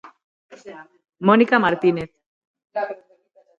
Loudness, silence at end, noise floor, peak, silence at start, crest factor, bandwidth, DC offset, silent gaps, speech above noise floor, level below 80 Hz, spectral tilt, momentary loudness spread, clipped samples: -19 LUFS; 0.65 s; -57 dBFS; -2 dBFS; 0.5 s; 20 dB; 7.4 kHz; under 0.1%; 2.26-2.41 s, 2.47-2.54 s; 38 dB; -62 dBFS; -7.5 dB/octave; 25 LU; under 0.1%